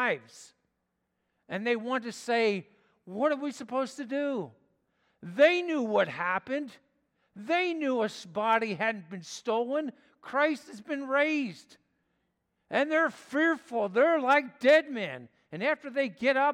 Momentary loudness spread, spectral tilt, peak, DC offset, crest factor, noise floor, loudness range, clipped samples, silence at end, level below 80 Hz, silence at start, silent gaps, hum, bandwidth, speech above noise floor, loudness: 14 LU; -4.5 dB/octave; -10 dBFS; under 0.1%; 20 dB; -80 dBFS; 5 LU; under 0.1%; 0 s; -84 dBFS; 0 s; none; none; 12 kHz; 51 dB; -29 LUFS